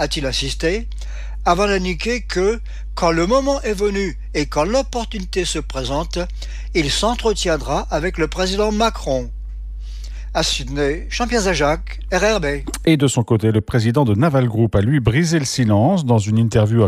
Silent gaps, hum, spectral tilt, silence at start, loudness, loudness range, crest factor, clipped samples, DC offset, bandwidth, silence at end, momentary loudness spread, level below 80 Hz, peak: none; none; -5.5 dB/octave; 0 s; -18 LUFS; 5 LU; 16 dB; under 0.1%; under 0.1%; 15 kHz; 0 s; 9 LU; -28 dBFS; -2 dBFS